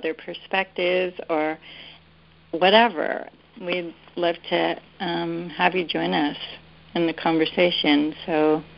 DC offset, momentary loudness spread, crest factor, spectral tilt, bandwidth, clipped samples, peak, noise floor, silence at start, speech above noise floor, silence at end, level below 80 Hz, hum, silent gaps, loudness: under 0.1%; 16 LU; 22 dB; -9.5 dB/octave; 5.6 kHz; under 0.1%; -2 dBFS; -54 dBFS; 0 s; 31 dB; 0.05 s; -62 dBFS; none; none; -23 LUFS